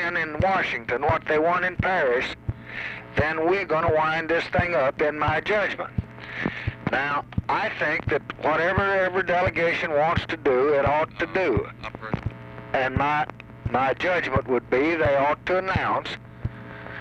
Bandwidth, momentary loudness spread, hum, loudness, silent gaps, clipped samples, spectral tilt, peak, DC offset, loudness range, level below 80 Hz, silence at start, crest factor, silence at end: 9 kHz; 11 LU; none; -24 LUFS; none; under 0.1%; -7 dB/octave; -8 dBFS; under 0.1%; 3 LU; -44 dBFS; 0 s; 18 dB; 0 s